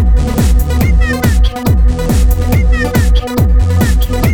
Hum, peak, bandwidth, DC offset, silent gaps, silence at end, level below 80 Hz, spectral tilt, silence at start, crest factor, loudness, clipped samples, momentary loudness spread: none; 0 dBFS; 19.5 kHz; under 0.1%; none; 0 s; -10 dBFS; -6.5 dB/octave; 0 s; 8 dB; -12 LUFS; under 0.1%; 1 LU